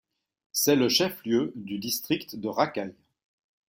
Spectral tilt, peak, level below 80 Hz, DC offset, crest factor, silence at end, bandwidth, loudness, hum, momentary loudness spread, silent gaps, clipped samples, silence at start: -3.5 dB/octave; -8 dBFS; -68 dBFS; under 0.1%; 20 dB; 0.75 s; 17 kHz; -27 LUFS; none; 11 LU; none; under 0.1%; 0.55 s